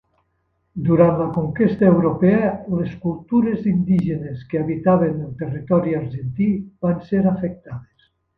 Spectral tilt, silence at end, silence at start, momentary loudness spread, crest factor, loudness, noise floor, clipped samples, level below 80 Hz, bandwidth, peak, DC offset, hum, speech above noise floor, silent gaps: -11.5 dB/octave; 0.55 s; 0.75 s; 12 LU; 18 dB; -20 LUFS; -69 dBFS; under 0.1%; -48 dBFS; 4.5 kHz; 0 dBFS; under 0.1%; none; 50 dB; none